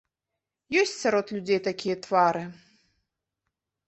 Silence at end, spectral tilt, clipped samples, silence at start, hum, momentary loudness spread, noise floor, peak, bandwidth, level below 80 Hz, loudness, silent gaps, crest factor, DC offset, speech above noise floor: 1.35 s; -4 dB/octave; under 0.1%; 0.7 s; none; 8 LU; -86 dBFS; -8 dBFS; 8.4 kHz; -72 dBFS; -26 LUFS; none; 20 dB; under 0.1%; 61 dB